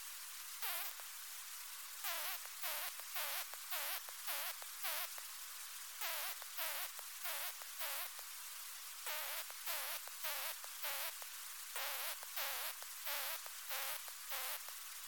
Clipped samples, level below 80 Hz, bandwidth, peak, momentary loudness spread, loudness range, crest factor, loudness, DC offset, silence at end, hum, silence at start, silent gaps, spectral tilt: under 0.1%; under -90 dBFS; 18 kHz; -24 dBFS; 7 LU; 1 LU; 22 dB; -42 LUFS; under 0.1%; 0 s; 50 Hz at -95 dBFS; 0 s; none; 4 dB/octave